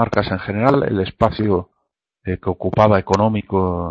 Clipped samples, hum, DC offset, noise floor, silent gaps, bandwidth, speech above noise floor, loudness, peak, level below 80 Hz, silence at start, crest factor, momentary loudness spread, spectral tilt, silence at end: under 0.1%; none; under 0.1%; -74 dBFS; none; 7.6 kHz; 57 dB; -18 LUFS; 0 dBFS; -42 dBFS; 0 s; 18 dB; 9 LU; -7.5 dB/octave; 0 s